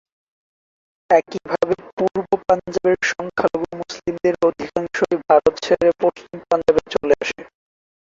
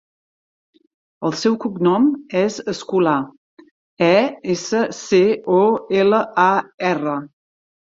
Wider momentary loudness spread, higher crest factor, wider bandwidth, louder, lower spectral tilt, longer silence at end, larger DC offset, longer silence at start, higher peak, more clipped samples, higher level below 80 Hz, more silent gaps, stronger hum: about the same, 10 LU vs 8 LU; about the same, 18 dB vs 18 dB; about the same, 7.8 kHz vs 7.8 kHz; about the same, -19 LUFS vs -18 LUFS; about the same, -5 dB/octave vs -5.5 dB/octave; about the same, 0.6 s vs 0.65 s; neither; about the same, 1.1 s vs 1.2 s; about the same, -2 dBFS vs -2 dBFS; neither; first, -52 dBFS vs -64 dBFS; second, 1.93-1.97 s vs 3.38-3.57 s, 3.71-3.97 s, 6.74-6.78 s; neither